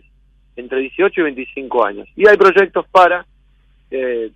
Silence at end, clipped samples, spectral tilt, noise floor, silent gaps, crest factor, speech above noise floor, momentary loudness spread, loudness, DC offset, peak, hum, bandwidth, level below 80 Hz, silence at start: 0.1 s; under 0.1%; -5.5 dB/octave; -52 dBFS; none; 14 dB; 38 dB; 14 LU; -14 LUFS; under 0.1%; 0 dBFS; none; 8.4 kHz; -52 dBFS; 0.55 s